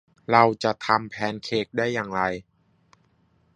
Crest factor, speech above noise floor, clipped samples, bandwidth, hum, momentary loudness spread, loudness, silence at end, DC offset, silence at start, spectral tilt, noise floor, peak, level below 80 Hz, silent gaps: 24 dB; 41 dB; under 0.1%; 10.5 kHz; none; 10 LU; -24 LUFS; 1.15 s; under 0.1%; 0.3 s; -5.5 dB/octave; -64 dBFS; -2 dBFS; -60 dBFS; none